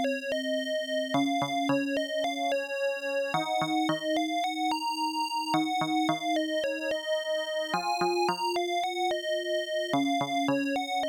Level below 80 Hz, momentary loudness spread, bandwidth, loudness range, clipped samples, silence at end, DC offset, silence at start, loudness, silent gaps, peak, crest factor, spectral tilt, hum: -74 dBFS; 3 LU; 19 kHz; 1 LU; under 0.1%; 0 s; under 0.1%; 0 s; -29 LUFS; none; -16 dBFS; 14 dB; -4 dB/octave; none